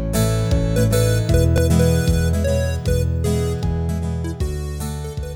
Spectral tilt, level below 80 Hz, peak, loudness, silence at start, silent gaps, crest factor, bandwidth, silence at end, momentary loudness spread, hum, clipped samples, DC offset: -6.5 dB/octave; -26 dBFS; -4 dBFS; -19 LUFS; 0 s; none; 14 dB; 18.5 kHz; 0 s; 9 LU; none; under 0.1%; under 0.1%